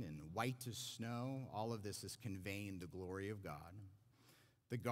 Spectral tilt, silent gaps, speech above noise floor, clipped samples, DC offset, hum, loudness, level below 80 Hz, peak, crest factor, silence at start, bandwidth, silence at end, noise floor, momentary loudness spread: -5 dB/octave; none; 24 dB; under 0.1%; under 0.1%; none; -48 LUFS; -74 dBFS; -24 dBFS; 22 dB; 0 s; 16 kHz; 0 s; -71 dBFS; 9 LU